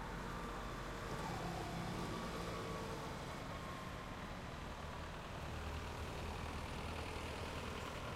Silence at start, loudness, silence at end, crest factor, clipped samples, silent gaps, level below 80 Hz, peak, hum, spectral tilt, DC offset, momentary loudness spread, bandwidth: 0 s; -46 LUFS; 0 s; 14 dB; under 0.1%; none; -54 dBFS; -32 dBFS; none; -5 dB/octave; under 0.1%; 4 LU; 16 kHz